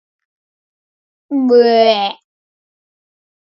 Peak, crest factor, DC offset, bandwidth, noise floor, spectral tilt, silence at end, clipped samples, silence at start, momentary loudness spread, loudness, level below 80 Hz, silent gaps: 0 dBFS; 16 dB; under 0.1%; 6 kHz; under -90 dBFS; -5.5 dB/octave; 1.35 s; under 0.1%; 1.3 s; 12 LU; -13 LUFS; -76 dBFS; none